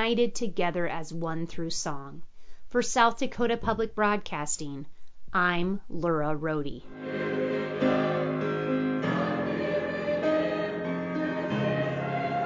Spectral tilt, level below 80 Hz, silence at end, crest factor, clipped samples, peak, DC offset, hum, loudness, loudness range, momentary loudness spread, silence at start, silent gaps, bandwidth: -5 dB/octave; -54 dBFS; 0 s; 18 dB; under 0.1%; -10 dBFS; under 0.1%; none; -29 LUFS; 2 LU; 8 LU; 0 s; none; 8 kHz